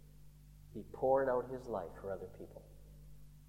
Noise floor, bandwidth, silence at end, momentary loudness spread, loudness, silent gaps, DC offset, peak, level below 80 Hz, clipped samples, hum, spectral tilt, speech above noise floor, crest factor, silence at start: -58 dBFS; 16 kHz; 0 s; 26 LU; -38 LUFS; none; under 0.1%; -20 dBFS; -60 dBFS; under 0.1%; 50 Hz at -60 dBFS; -7.5 dB/octave; 20 dB; 20 dB; 0 s